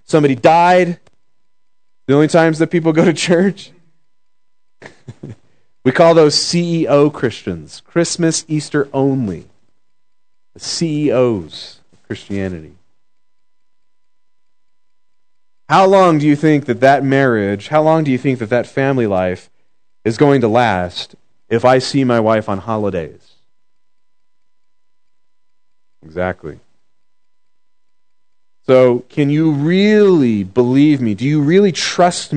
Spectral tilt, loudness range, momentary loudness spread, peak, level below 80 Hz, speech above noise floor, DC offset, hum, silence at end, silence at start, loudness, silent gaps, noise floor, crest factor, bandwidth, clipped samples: -5.5 dB/octave; 17 LU; 16 LU; 0 dBFS; -58 dBFS; 62 dB; 0.4%; none; 0 s; 0.1 s; -14 LUFS; none; -75 dBFS; 16 dB; 9.4 kHz; under 0.1%